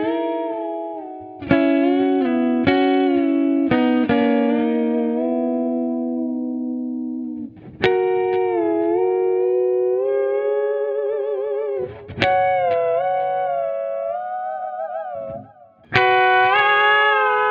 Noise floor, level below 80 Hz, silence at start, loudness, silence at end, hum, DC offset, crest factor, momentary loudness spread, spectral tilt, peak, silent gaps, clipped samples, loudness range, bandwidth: -46 dBFS; -58 dBFS; 0 s; -19 LUFS; 0 s; none; under 0.1%; 18 dB; 13 LU; -7.5 dB/octave; 0 dBFS; none; under 0.1%; 5 LU; 6.8 kHz